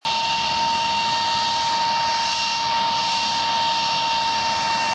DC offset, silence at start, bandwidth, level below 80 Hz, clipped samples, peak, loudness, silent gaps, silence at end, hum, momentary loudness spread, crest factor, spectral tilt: under 0.1%; 0.05 s; 10 kHz; -54 dBFS; under 0.1%; -10 dBFS; -20 LUFS; none; 0 s; none; 1 LU; 12 dB; -1 dB/octave